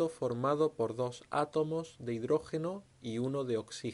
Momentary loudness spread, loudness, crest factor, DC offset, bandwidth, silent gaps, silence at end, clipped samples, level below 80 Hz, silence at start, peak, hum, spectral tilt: 8 LU; -35 LUFS; 16 dB; under 0.1%; 11.5 kHz; none; 0 s; under 0.1%; -70 dBFS; 0 s; -18 dBFS; none; -6.5 dB/octave